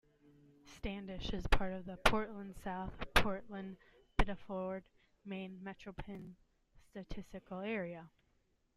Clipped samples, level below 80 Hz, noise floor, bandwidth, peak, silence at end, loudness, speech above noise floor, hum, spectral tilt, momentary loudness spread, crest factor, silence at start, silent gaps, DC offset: under 0.1%; -46 dBFS; -77 dBFS; 15.5 kHz; -12 dBFS; 0.7 s; -40 LUFS; 38 dB; none; -5 dB/octave; 18 LU; 28 dB; 0.65 s; none; under 0.1%